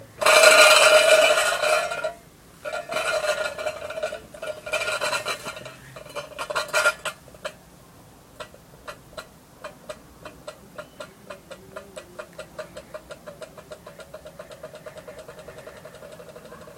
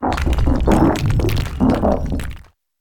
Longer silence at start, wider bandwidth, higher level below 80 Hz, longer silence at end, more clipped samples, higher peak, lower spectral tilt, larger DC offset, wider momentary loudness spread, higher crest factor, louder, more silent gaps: about the same, 0 s vs 0 s; second, 16.5 kHz vs 18.5 kHz; second, -60 dBFS vs -22 dBFS; second, 0.05 s vs 0.4 s; neither; about the same, 0 dBFS vs 0 dBFS; second, 0 dB/octave vs -7 dB/octave; neither; first, 28 LU vs 10 LU; first, 24 dB vs 16 dB; about the same, -19 LUFS vs -18 LUFS; neither